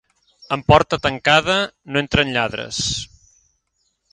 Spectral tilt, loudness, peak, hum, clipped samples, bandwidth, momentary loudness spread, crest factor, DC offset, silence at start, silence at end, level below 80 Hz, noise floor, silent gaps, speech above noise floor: -4 dB/octave; -18 LUFS; 0 dBFS; none; under 0.1%; 11.5 kHz; 9 LU; 20 dB; under 0.1%; 0.5 s; 1.1 s; -40 dBFS; -69 dBFS; none; 51 dB